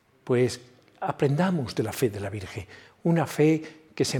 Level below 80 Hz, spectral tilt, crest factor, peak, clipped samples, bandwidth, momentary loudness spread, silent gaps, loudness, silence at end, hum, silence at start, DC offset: -64 dBFS; -6 dB/octave; 16 dB; -10 dBFS; under 0.1%; 18 kHz; 16 LU; none; -26 LUFS; 0 s; none; 0.25 s; under 0.1%